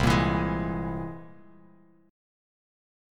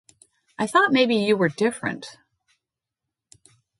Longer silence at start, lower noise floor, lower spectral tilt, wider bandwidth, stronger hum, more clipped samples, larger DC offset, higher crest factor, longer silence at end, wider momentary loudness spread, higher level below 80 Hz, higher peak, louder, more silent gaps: second, 0 s vs 0.6 s; second, -58 dBFS vs -85 dBFS; first, -6.5 dB/octave vs -5 dB/octave; first, 17 kHz vs 11.5 kHz; neither; neither; neither; about the same, 22 dB vs 20 dB; about the same, 1.8 s vs 1.7 s; about the same, 16 LU vs 14 LU; first, -42 dBFS vs -70 dBFS; second, -10 dBFS vs -6 dBFS; second, -28 LUFS vs -21 LUFS; neither